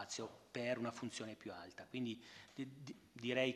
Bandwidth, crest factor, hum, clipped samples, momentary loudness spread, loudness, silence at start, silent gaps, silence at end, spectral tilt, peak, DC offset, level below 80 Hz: 13 kHz; 22 dB; none; under 0.1%; 12 LU; -46 LUFS; 0 s; none; 0 s; -4 dB/octave; -24 dBFS; under 0.1%; -84 dBFS